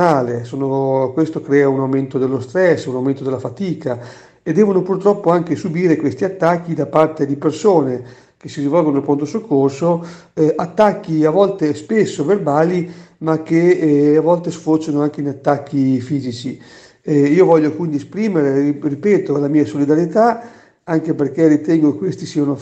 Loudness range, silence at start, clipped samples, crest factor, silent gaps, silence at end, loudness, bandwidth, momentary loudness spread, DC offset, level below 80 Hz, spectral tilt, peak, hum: 2 LU; 0 s; under 0.1%; 16 dB; none; 0 s; -16 LUFS; 8.4 kHz; 9 LU; under 0.1%; -60 dBFS; -7.5 dB/octave; 0 dBFS; none